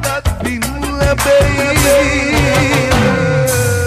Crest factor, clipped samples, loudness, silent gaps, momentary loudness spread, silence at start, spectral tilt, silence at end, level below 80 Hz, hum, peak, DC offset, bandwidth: 12 dB; under 0.1%; -12 LUFS; none; 8 LU; 0 s; -4.5 dB/octave; 0 s; -24 dBFS; none; 0 dBFS; under 0.1%; 15.5 kHz